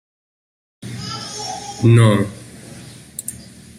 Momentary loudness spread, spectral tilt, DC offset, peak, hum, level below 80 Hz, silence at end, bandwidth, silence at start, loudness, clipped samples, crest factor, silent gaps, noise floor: 25 LU; -6 dB/octave; under 0.1%; -2 dBFS; none; -52 dBFS; 0.15 s; 15.5 kHz; 0.85 s; -18 LUFS; under 0.1%; 18 dB; none; -38 dBFS